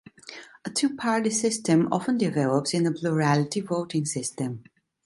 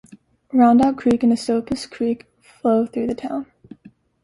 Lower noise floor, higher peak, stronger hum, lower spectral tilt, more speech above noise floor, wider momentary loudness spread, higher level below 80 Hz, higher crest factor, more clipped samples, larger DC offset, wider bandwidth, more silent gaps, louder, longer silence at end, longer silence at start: second, -45 dBFS vs -50 dBFS; second, -8 dBFS vs -4 dBFS; neither; about the same, -5 dB/octave vs -6 dB/octave; second, 21 dB vs 32 dB; about the same, 13 LU vs 14 LU; second, -68 dBFS vs -54 dBFS; about the same, 18 dB vs 16 dB; neither; neither; about the same, 11.5 kHz vs 11.5 kHz; neither; second, -25 LUFS vs -20 LUFS; second, 0.45 s vs 0.8 s; second, 0.25 s vs 0.55 s